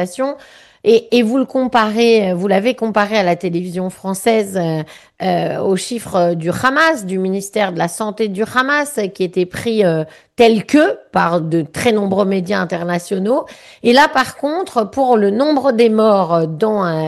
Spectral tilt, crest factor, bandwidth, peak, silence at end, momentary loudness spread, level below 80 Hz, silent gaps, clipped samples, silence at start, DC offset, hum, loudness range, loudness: -5.5 dB/octave; 14 dB; 12.5 kHz; -2 dBFS; 0 s; 8 LU; -56 dBFS; none; under 0.1%; 0 s; under 0.1%; none; 3 LU; -15 LUFS